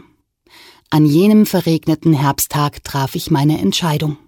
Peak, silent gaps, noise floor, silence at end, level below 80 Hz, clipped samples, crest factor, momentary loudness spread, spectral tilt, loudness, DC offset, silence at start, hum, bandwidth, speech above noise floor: -4 dBFS; none; -54 dBFS; 0.15 s; -46 dBFS; under 0.1%; 12 dB; 8 LU; -6 dB/octave; -15 LUFS; under 0.1%; 0.9 s; none; 18 kHz; 40 dB